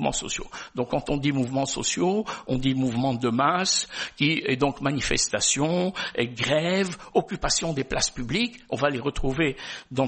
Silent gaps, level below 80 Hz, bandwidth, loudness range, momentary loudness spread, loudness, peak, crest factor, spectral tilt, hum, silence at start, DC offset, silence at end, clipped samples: none; -42 dBFS; 8.8 kHz; 2 LU; 6 LU; -25 LUFS; -6 dBFS; 18 dB; -3.5 dB/octave; none; 0 s; under 0.1%; 0 s; under 0.1%